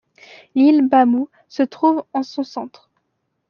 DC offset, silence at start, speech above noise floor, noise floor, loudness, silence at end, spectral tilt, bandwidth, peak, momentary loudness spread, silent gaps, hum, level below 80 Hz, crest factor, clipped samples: under 0.1%; 0.55 s; 55 dB; -72 dBFS; -18 LUFS; 0.8 s; -6 dB/octave; 6.8 kHz; -2 dBFS; 15 LU; none; none; -68 dBFS; 16 dB; under 0.1%